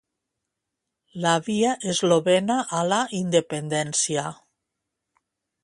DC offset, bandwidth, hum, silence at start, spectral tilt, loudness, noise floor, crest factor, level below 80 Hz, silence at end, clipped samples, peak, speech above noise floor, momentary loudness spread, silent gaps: under 0.1%; 11.5 kHz; none; 1.15 s; -4 dB/octave; -23 LUFS; -83 dBFS; 20 dB; -68 dBFS; 1.3 s; under 0.1%; -6 dBFS; 60 dB; 7 LU; none